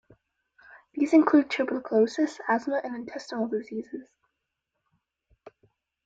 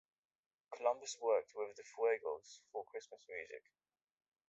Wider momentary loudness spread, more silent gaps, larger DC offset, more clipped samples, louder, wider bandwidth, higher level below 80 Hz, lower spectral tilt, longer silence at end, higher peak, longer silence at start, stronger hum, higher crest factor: about the same, 16 LU vs 15 LU; neither; neither; neither; first, -26 LUFS vs -41 LUFS; about the same, 7.8 kHz vs 8 kHz; first, -72 dBFS vs -90 dBFS; first, -5.5 dB/octave vs 0.5 dB/octave; first, 2.05 s vs 0.9 s; first, -8 dBFS vs -22 dBFS; about the same, 0.75 s vs 0.7 s; neither; about the same, 20 dB vs 20 dB